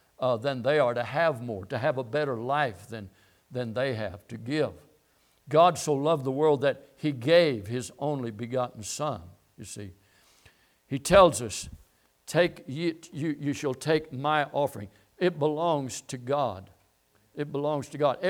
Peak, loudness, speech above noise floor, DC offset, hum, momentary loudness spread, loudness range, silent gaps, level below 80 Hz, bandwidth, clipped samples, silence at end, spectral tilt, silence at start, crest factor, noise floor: -6 dBFS; -27 LUFS; 40 dB; under 0.1%; none; 19 LU; 6 LU; none; -58 dBFS; 17.5 kHz; under 0.1%; 0 s; -5 dB/octave; 0.2 s; 22 dB; -67 dBFS